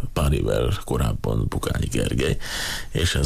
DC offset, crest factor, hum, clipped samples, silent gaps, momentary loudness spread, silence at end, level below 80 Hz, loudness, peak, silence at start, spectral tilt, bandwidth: under 0.1%; 14 dB; none; under 0.1%; none; 4 LU; 0 s; -30 dBFS; -24 LUFS; -10 dBFS; 0 s; -5 dB/octave; 15.5 kHz